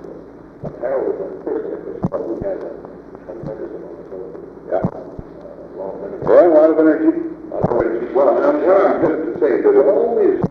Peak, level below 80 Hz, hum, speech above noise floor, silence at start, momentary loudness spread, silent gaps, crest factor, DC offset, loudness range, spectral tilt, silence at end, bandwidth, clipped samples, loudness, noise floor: 0 dBFS; -48 dBFS; none; 21 dB; 0 s; 22 LU; none; 16 dB; under 0.1%; 13 LU; -10 dB/octave; 0 s; 6 kHz; under 0.1%; -16 LUFS; -37 dBFS